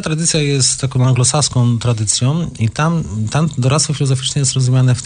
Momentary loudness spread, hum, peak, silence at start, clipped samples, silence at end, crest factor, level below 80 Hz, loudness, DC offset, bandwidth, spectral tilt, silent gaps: 5 LU; none; -2 dBFS; 0 s; under 0.1%; 0 s; 14 dB; -40 dBFS; -15 LUFS; under 0.1%; 10 kHz; -4.5 dB/octave; none